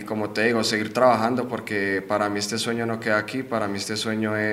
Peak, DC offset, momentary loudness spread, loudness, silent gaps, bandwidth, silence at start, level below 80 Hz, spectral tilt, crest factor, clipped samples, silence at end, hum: -4 dBFS; under 0.1%; 7 LU; -24 LUFS; none; 16 kHz; 0 s; -64 dBFS; -4 dB/octave; 20 dB; under 0.1%; 0 s; none